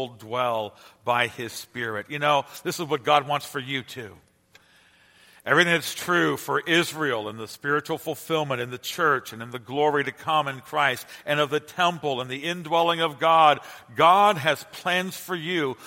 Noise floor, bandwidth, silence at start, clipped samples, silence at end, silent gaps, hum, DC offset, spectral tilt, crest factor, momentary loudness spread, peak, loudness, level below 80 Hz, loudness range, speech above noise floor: -58 dBFS; 16.5 kHz; 0 s; under 0.1%; 0 s; none; none; under 0.1%; -4 dB/octave; 22 dB; 13 LU; -4 dBFS; -24 LUFS; -70 dBFS; 5 LU; 33 dB